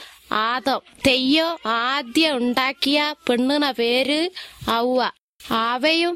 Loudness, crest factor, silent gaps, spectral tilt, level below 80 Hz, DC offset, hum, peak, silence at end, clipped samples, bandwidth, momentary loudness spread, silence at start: -20 LUFS; 16 dB; 5.20-5.39 s; -3 dB/octave; -54 dBFS; under 0.1%; none; -6 dBFS; 0 s; under 0.1%; 16 kHz; 6 LU; 0 s